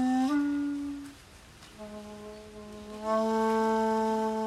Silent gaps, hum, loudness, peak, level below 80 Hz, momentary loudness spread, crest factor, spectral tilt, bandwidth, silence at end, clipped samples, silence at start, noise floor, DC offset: none; none; -29 LUFS; -18 dBFS; -60 dBFS; 20 LU; 14 dB; -5.5 dB/octave; 13.5 kHz; 0 s; under 0.1%; 0 s; -52 dBFS; under 0.1%